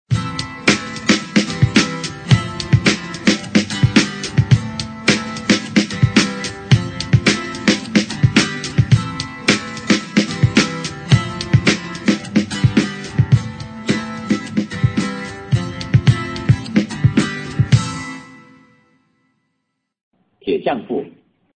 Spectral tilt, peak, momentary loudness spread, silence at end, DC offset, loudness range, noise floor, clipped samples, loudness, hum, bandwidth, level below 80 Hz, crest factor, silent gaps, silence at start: -5 dB/octave; 0 dBFS; 8 LU; 0.5 s; under 0.1%; 5 LU; -73 dBFS; under 0.1%; -17 LUFS; none; 9.4 kHz; -38 dBFS; 18 dB; 20.03-20.11 s; 0.1 s